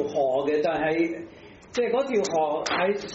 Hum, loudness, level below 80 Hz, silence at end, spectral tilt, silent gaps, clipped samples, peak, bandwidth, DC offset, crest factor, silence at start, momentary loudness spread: none; -25 LUFS; -60 dBFS; 0 s; -3 dB/octave; none; under 0.1%; -10 dBFS; 8 kHz; under 0.1%; 14 dB; 0 s; 6 LU